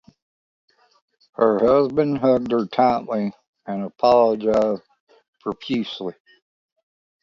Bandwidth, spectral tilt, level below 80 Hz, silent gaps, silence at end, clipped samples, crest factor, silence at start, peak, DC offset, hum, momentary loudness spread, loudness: 7.4 kHz; -7.5 dB/octave; -58 dBFS; 3.47-3.53 s, 5.00-5.07 s, 5.28-5.33 s; 1.1 s; under 0.1%; 18 dB; 1.4 s; -4 dBFS; under 0.1%; none; 15 LU; -20 LUFS